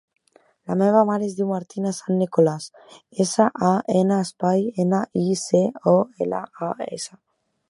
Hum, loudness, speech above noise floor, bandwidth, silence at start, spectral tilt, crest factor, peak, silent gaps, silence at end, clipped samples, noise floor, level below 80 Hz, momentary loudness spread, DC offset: none; -22 LUFS; 38 dB; 11.5 kHz; 0.7 s; -6.5 dB/octave; 20 dB; -2 dBFS; none; 0.6 s; under 0.1%; -59 dBFS; -68 dBFS; 11 LU; under 0.1%